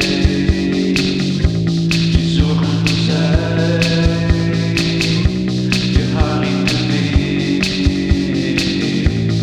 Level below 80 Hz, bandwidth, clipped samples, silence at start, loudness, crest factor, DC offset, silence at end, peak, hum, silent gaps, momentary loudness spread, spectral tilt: -24 dBFS; 12.5 kHz; under 0.1%; 0 s; -15 LUFS; 14 dB; under 0.1%; 0 s; 0 dBFS; none; none; 2 LU; -6 dB/octave